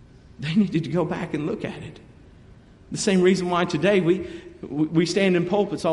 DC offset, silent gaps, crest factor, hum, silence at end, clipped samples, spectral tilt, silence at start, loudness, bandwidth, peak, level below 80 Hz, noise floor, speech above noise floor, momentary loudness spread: under 0.1%; none; 16 dB; none; 0 s; under 0.1%; -6 dB/octave; 0.4 s; -23 LUFS; 11.5 kHz; -6 dBFS; -54 dBFS; -49 dBFS; 26 dB; 15 LU